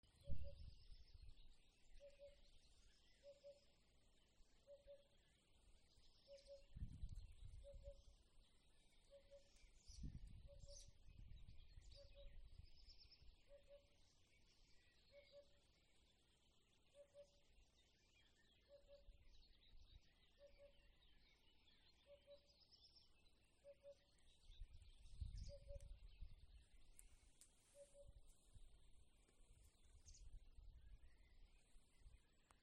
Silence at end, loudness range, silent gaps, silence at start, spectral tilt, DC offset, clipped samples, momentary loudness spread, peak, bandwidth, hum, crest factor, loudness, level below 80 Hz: 0 s; 4 LU; none; 0.05 s; -5 dB/octave; under 0.1%; under 0.1%; 11 LU; -32 dBFS; 10 kHz; none; 28 dB; -65 LUFS; -66 dBFS